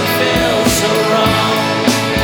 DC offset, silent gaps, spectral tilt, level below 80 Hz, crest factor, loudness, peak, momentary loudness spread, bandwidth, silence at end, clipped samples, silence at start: under 0.1%; none; -4 dB/octave; -34 dBFS; 12 dB; -13 LUFS; 0 dBFS; 2 LU; over 20 kHz; 0 s; under 0.1%; 0 s